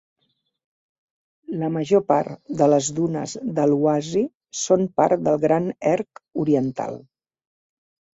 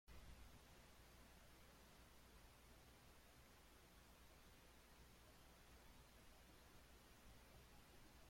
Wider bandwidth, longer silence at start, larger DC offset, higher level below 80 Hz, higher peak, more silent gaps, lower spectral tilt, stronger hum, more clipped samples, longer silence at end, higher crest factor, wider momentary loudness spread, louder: second, 8 kHz vs 16.5 kHz; first, 1.5 s vs 0.05 s; neither; first, -64 dBFS vs -72 dBFS; first, -2 dBFS vs -50 dBFS; first, 4.35-4.40 s vs none; first, -6 dB/octave vs -3.5 dB/octave; second, none vs 60 Hz at -75 dBFS; neither; first, 1.2 s vs 0 s; about the same, 20 dB vs 16 dB; first, 10 LU vs 2 LU; first, -22 LUFS vs -68 LUFS